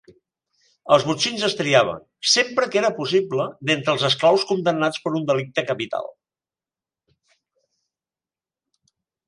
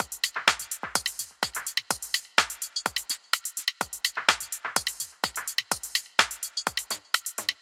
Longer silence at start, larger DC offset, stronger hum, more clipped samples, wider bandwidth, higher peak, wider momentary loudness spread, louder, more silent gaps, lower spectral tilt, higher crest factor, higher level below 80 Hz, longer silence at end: first, 0.85 s vs 0 s; neither; neither; neither; second, 11.5 kHz vs 17 kHz; about the same, -2 dBFS vs -2 dBFS; about the same, 8 LU vs 7 LU; first, -20 LUFS vs -28 LUFS; neither; first, -3.5 dB/octave vs 1 dB/octave; second, 22 dB vs 28 dB; about the same, -66 dBFS vs -64 dBFS; first, 3.2 s vs 0.1 s